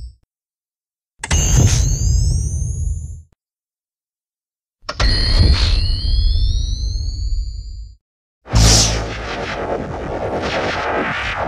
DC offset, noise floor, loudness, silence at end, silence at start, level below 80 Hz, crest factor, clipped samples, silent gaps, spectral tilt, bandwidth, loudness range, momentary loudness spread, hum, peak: under 0.1%; under -90 dBFS; -18 LUFS; 0 s; 0 s; -20 dBFS; 18 dB; under 0.1%; 8.01-8.41 s; -3.5 dB/octave; 15.5 kHz; 4 LU; 14 LU; none; 0 dBFS